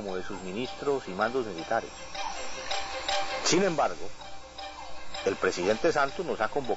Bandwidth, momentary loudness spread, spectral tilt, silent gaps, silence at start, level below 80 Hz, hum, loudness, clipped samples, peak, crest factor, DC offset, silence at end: 8 kHz; 15 LU; -3.5 dB/octave; none; 0 s; -54 dBFS; none; -30 LUFS; under 0.1%; -12 dBFS; 18 dB; under 0.1%; 0 s